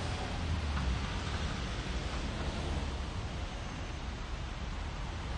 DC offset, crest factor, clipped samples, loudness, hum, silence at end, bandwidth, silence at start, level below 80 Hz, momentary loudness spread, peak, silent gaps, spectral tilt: under 0.1%; 14 dB; under 0.1%; -38 LUFS; none; 0 s; 10.5 kHz; 0 s; -40 dBFS; 6 LU; -22 dBFS; none; -5 dB/octave